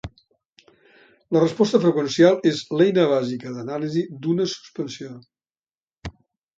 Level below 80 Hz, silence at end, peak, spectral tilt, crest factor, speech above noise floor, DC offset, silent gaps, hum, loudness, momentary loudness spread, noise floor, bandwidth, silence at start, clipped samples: -54 dBFS; 0.45 s; -2 dBFS; -6 dB/octave; 20 dB; over 70 dB; under 0.1%; 0.45-0.56 s, 5.59-5.63 s, 5.71-5.86 s; none; -21 LUFS; 22 LU; under -90 dBFS; 7.8 kHz; 0.05 s; under 0.1%